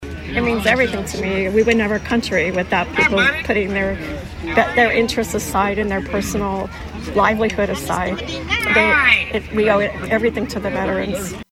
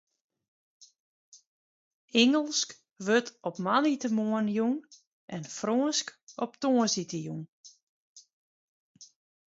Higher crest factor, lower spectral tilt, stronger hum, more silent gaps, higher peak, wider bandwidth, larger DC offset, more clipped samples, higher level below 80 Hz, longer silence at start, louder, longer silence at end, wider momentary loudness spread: about the same, 18 dB vs 22 dB; about the same, -4.5 dB/octave vs -3.5 dB/octave; neither; second, none vs 1.00-1.32 s, 1.47-2.08 s, 5.07-5.28 s, 6.22-6.27 s, 7.48-7.64 s, 7.83-8.15 s, 8.33-8.95 s; first, 0 dBFS vs -10 dBFS; first, 16.5 kHz vs 7.8 kHz; neither; neither; first, -36 dBFS vs -80 dBFS; second, 0 s vs 0.8 s; first, -18 LUFS vs -29 LUFS; second, 0.1 s vs 0.5 s; second, 9 LU vs 15 LU